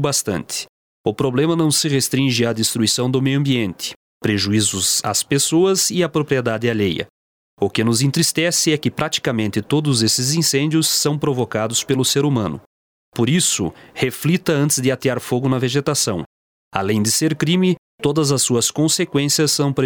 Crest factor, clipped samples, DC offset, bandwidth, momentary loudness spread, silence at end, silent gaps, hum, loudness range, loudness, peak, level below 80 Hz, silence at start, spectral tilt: 18 dB; under 0.1%; under 0.1%; over 20 kHz; 8 LU; 0 s; 0.69-1.04 s, 3.96-4.21 s, 7.10-7.57 s, 12.66-13.12 s, 16.26-16.71 s, 17.78-17.98 s; none; 2 LU; -18 LUFS; 0 dBFS; -54 dBFS; 0 s; -4 dB/octave